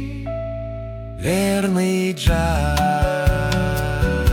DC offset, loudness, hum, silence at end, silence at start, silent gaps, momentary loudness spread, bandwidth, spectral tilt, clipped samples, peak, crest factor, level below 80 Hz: under 0.1%; -20 LUFS; none; 0 s; 0 s; none; 10 LU; 18 kHz; -6 dB/octave; under 0.1%; -4 dBFS; 14 dB; -26 dBFS